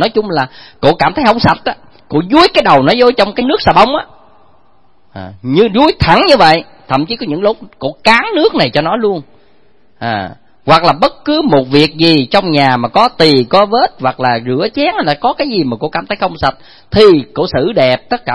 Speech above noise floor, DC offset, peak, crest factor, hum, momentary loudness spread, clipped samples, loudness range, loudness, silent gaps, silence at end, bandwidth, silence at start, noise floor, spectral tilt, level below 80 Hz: 42 dB; 0.8%; 0 dBFS; 12 dB; none; 11 LU; 0.7%; 4 LU; -11 LUFS; none; 0 s; 11 kHz; 0 s; -53 dBFS; -6 dB/octave; -38 dBFS